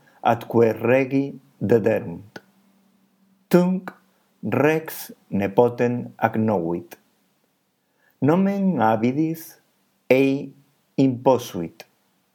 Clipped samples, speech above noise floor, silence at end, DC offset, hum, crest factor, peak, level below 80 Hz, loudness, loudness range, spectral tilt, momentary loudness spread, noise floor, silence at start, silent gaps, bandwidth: under 0.1%; 48 dB; 0.65 s; under 0.1%; none; 22 dB; 0 dBFS; -70 dBFS; -21 LUFS; 3 LU; -7.5 dB/octave; 15 LU; -69 dBFS; 0.25 s; none; 19 kHz